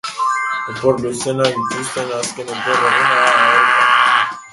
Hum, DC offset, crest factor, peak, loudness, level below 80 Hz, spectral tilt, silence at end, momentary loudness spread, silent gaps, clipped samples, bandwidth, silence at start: none; under 0.1%; 16 dB; 0 dBFS; -15 LUFS; -56 dBFS; -2.5 dB/octave; 0.05 s; 11 LU; none; under 0.1%; 11.5 kHz; 0.05 s